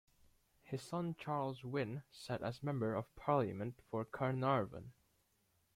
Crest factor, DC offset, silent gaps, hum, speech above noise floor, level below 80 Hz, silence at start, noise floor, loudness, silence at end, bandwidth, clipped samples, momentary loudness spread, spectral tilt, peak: 20 dB; under 0.1%; none; none; 38 dB; -72 dBFS; 0.65 s; -78 dBFS; -41 LUFS; 0.85 s; 15.5 kHz; under 0.1%; 11 LU; -7.5 dB/octave; -22 dBFS